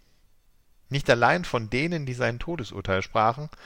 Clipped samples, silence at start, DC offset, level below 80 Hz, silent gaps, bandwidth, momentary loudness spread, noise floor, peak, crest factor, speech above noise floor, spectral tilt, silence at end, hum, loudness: under 0.1%; 0.9 s; under 0.1%; -46 dBFS; none; 16 kHz; 12 LU; -59 dBFS; -6 dBFS; 20 dB; 34 dB; -5.5 dB/octave; 0 s; none; -25 LUFS